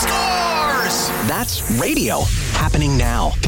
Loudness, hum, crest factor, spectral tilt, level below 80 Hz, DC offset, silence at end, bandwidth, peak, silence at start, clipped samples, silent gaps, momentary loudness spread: -18 LUFS; none; 12 dB; -4 dB/octave; -24 dBFS; under 0.1%; 0 s; 17 kHz; -6 dBFS; 0 s; under 0.1%; none; 2 LU